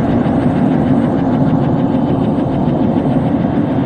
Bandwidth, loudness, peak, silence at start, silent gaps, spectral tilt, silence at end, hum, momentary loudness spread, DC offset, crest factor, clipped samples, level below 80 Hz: 9 kHz; -14 LUFS; -2 dBFS; 0 s; none; -10 dB/octave; 0 s; none; 2 LU; under 0.1%; 12 dB; under 0.1%; -34 dBFS